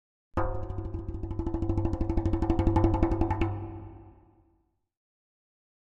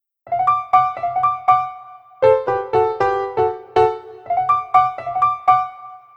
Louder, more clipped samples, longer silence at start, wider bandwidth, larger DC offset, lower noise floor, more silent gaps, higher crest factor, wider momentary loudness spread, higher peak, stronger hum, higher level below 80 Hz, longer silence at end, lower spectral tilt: second, -30 LUFS vs -18 LUFS; neither; about the same, 0.35 s vs 0.25 s; about the same, 7.4 kHz vs 7.6 kHz; neither; first, -71 dBFS vs -39 dBFS; neither; about the same, 22 dB vs 18 dB; first, 12 LU vs 9 LU; second, -8 dBFS vs -2 dBFS; neither; first, -36 dBFS vs -54 dBFS; first, 1.9 s vs 0.2 s; first, -9.5 dB/octave vs -6.5 dB/octave